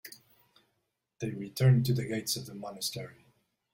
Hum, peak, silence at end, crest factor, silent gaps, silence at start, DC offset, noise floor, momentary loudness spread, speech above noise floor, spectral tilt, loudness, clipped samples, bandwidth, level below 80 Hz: none; -14 dBFS; 0.6 s; 18 dB; none; 0.05 s; under 0.1%; -81 dBFS; 18 LU; 51 dB; -5.5 dB/octave; -31 LUFS; under 0.1%; 16.5 kHz; -66 dBFS